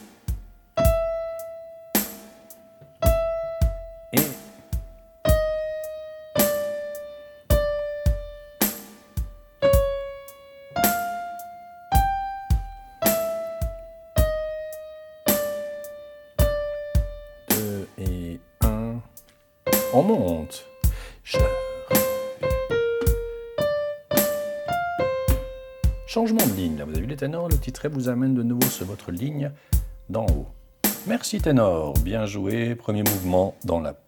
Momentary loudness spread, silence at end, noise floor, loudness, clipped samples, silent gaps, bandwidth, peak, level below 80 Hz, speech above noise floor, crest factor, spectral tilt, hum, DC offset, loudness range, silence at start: 15 LU; 0.1 s; -52 dBFS; -25 LUFS; under 0.1%; none; 19 kHz; -4 dBFS; -32 dBFS; 29 dB; 22 dB; -5.5 dB/octave; none; under 0.1%; 3 LU; 0 s